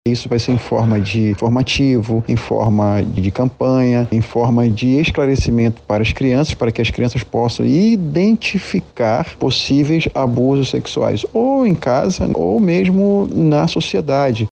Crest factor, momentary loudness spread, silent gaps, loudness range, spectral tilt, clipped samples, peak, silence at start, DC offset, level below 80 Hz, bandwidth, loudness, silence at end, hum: 12 dB; 4 LU; none; 1 LU; -7 dB/octave; under 0.1%; -2 dBFS; 0.05 s; under 0.1%; -36 dBFS; 8.8 kHz; -16 LUFS; 0.05 s; none